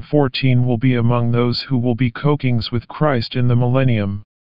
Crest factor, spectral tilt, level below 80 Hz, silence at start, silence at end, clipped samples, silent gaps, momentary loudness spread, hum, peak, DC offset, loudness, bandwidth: 16 dB; -6.5 dB/octave; -44 dBFS; 0 s; 0.2 s; under 0.1%; none; 3 LU; none; -2 dBFS; 3%; -18 LUFS; 5.4 kHz